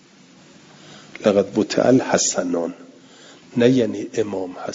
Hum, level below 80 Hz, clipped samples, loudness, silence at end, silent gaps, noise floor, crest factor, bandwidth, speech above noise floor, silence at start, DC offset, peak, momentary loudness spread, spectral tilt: none; -62 dBFS; under 0.1%; -20 LUFS; 0 s; none; -49 dBFS; 20 dB; 7.8 kHz; 30 dB; 0.85 s; under 0.1%; -2 dBFS; 12 LU; -4.5 dB/octave